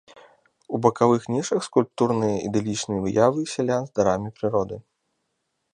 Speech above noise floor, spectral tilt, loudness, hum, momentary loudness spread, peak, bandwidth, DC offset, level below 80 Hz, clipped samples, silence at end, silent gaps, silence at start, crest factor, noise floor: 53 dB; -6 dB/octave; -23 LUFS; none; 6 LU; -4 dBFS; 10.5 kHz; under 0.1%; -56 dBFS; under 0.1%; 0.95 s; none; 0.15 s; 20 dB; -76 dBFS